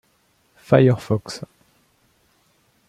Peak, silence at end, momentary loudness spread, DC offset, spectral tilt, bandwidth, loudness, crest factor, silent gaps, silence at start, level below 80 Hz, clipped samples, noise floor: -2 dBFS; 1.5 s; 19 LU; under 0.1%; -7.5 dB/octave; 12.5 kHz; -18 LUFS; 20 dB; none; 0.7 s; -58 dBFS; under 0.1%; -63 dBFS